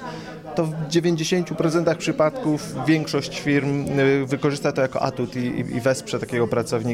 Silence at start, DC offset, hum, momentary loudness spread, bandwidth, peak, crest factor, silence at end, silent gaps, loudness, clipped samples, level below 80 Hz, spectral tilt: 0 s; under 0.1%; none; 5 LU; 16 kHz; -6 dBFS; 16 dB; 0 s; none; -22 LUFS; under 0.1%; -54 dBFS; -6 dB/octave